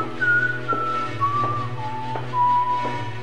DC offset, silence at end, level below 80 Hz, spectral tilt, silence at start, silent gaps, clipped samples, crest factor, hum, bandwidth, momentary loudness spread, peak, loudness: 3%; 0 s; -54 dBFS; -6 dB/octave; 0 s; none; under 0.1%; 12 dB; none; 11 kHz; 9 LU; -10 dBFS; -23 LUFS